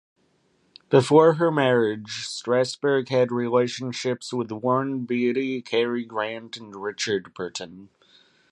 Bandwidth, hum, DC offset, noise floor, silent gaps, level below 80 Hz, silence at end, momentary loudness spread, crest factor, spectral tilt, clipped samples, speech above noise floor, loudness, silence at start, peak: 11.5 kHz; none; under 0.1%; -66 dBFS; none; -70 dBFS; 0.65 s; 14 LU; 22 dB; -5.5 dB/octave; under 0.1%; 43 dB; -23 LUFS; 0.9 s; -2 dBFS